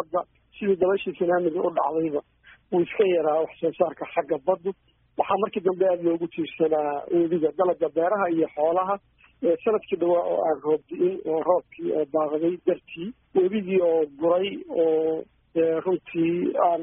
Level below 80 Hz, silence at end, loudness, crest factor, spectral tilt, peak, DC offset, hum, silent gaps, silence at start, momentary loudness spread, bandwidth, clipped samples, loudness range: -66 dBFS; 0 s; -25 LUFS; 18 dB; -3.5 dB/octave; -8 dBFS; under 0.1%; none; none; 0 s; 7 LU; 3.8 kHz; under 0.1%; 2 LU